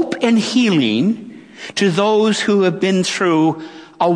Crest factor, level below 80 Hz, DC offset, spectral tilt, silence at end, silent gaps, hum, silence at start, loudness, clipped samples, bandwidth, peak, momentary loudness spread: 16 dB; -66 dBFS; under 0.1%; -5 dB/octave; 0 s; none; none; 0 s; -16 LUFS; under 0.1%; 10.5 kHz; 0 dBFS; 12 LU